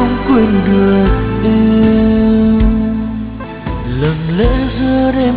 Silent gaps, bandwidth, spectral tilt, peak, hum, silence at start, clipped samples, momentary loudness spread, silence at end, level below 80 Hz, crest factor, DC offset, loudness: none; 4 kHz; -12 dB/octave; 0 dBFS; none; 0 s; under 0.1%; 11 LU; 0 s; -20 dBFS; 10 dB; under 0.1%; -12 LUFS